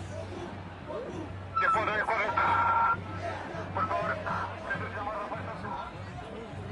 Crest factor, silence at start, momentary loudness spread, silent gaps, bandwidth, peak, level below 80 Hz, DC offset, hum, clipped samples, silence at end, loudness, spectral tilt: 18 dB; 0 s; 15 LU; none; 11 kHz; -14 dBFS; -56 dBFS; under 0.1%; none; under 0.1%; 0 s; -31 LUFS; -6 dB/octave